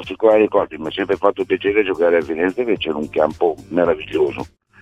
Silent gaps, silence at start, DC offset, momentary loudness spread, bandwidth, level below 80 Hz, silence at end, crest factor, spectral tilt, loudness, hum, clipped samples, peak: none; 0 s; under 0.1%; 6 LU; 8.8 kHz; -50 dBFS; 0.35 s; 18 dB; -6.5 dB/octave; -18 LUFS; none; under 0.1%; 0 dBFS